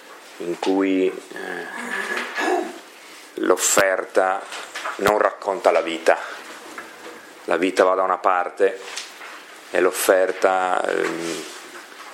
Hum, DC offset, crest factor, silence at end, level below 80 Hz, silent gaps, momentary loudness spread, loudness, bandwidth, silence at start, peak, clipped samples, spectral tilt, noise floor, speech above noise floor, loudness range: none; under 0.1%; 22 dB; 0 s; -64 dBFS; none; 19 LU; -21 LUFS; 16.5 kHz; 0 s; 0 dBFS; under 0.1%; -2.5 dB/octave; -43 dBFS; 22 dB; 3 LU